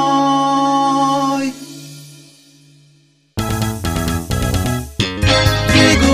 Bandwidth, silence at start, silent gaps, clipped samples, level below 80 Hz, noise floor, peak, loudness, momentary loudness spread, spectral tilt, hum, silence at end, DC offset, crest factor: 16 kHz; 0 s; none; under 0.1%; -30 dBFS; -53 dBFS; 0 dBFS; -15 LUFS; 18 LU; -4.5 dB/octave; none; 0 s; under 0.1%; 16 dB